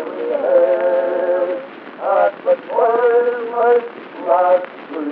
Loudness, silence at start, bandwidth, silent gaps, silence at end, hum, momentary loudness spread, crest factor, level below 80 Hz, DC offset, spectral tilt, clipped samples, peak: -16 LUFS; 0 s; 4.5 kHz; none; 0 s; none; 12 LU; 14 dB; -88 dBFS; under 0.1%; -2.5 dB/octave; under 0.1%; -2 dBFS